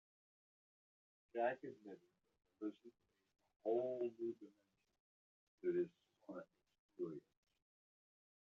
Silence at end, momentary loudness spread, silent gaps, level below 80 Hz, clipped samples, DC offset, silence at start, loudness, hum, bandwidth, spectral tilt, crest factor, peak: 1.2 s; 22 LU; 3.56-3.60 s, 5.00-5.58 s, 6.79-6.89 s; under -90 dBFS; under 0.1%; under 0.1%; 1.35 s; -46 LUFS; none; 4.1 kHz; -6 dB/octave; 22 dB; -28 dBFS